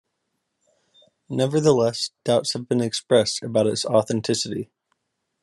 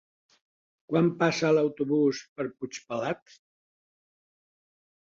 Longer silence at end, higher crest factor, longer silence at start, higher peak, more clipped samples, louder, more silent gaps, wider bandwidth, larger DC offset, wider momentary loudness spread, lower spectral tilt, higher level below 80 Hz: second, 0.8 s vs 1.9 s; about the same, 20 dB vs 20 dB; first, 1.3 s vs 0.9 s; first, -4 dBFS vs -10 dBFS; neither; first, -22 LUFS vs -27 LUFS; second, none vs 2.29-2.36 s; first, 12.5 kHz vs 7.8 kHz; neither; second, 9 LU vs 12 LU; about the same, -5 dB/octave vs -6 dB/octave; first, -64 dBFS vs -72 dBFS